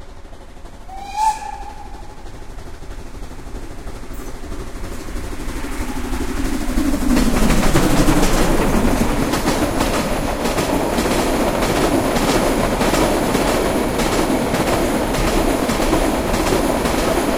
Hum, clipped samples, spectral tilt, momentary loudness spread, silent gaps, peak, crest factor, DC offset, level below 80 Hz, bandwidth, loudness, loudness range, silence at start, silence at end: none; under 0.1%; -4.5 dB/octave; 18 LU; none; -2 dBFS; 16 dB; under 0.1%; -24 dBFS; 16.5 kHz; -18 LUFS; 14 LU; 0 s; 0 s